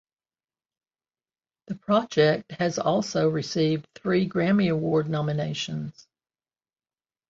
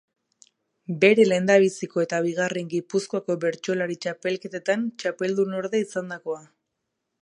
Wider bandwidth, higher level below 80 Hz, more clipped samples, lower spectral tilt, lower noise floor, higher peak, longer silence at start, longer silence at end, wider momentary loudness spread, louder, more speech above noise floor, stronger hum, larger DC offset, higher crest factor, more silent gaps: second, 7.8 kHz vs 11 kHz; first, -64 dBFS vs -76 dBFS; neither; about the same, -6 dB/octave vs -5 dB/octave; first, under -90 dBFS vs -80 dBFS; second, -8 dBFS vs -4 dBFS; first, 1.7 s vs 0.9 s; first, 1.4 s vs 0.85 s; second, 9 LU vs 13 LU; about the same, -25 LUFS vs -24 LUFS; first, over 66 dB vs 57 dB; neither; neither; about the same, 20 dB vs 20 dB; neither